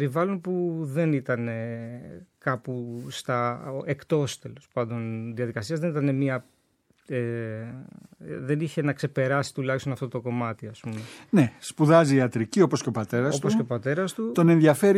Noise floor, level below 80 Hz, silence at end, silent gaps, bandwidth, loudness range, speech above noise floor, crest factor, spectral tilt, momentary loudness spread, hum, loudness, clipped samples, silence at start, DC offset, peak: -67 dBFS; -68 dBFS; 0 s; none; 15 kHz; 7 LU; 41 dB; 22 dB; -6.5 dB/octave; 16 LU; none; -26 LUFS; under 0.1%; 0 s; under 0.1%; -4 dBFS